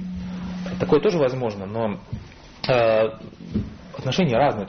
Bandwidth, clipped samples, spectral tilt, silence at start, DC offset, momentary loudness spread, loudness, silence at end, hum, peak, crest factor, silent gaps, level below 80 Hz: 6.6 kHz; under 0.1%; -5.5 dB/octave; 0 s; under 0.1%; 15 LU; -23 LUFS; 0 s; none; -6 dBFS; 16 dB; none; -46 dBFS